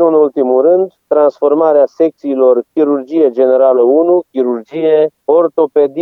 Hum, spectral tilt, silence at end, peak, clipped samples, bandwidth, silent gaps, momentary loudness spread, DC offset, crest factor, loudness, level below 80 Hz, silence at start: none; -8.5 dB/octave; 0 s; 0 dBFS; under 0.1%; 5.6 kHz; none; 5 LU; under 0.1%; 10 dB; -11 LUFS; -74 dBFS; 0 s